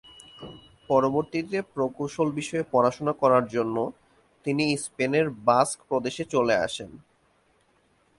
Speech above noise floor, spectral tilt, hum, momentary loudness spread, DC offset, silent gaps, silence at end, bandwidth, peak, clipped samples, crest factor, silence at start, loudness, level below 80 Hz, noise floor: 40 dB; -5 dB/octave; none; 13 LU; under 0.1%; none; 1.2 s; 11.5 kHz; -6 dBFS; under 0.1%; 20 dB; 0.4 s; -26 LUFS; -62 dBFS; -65 dBFS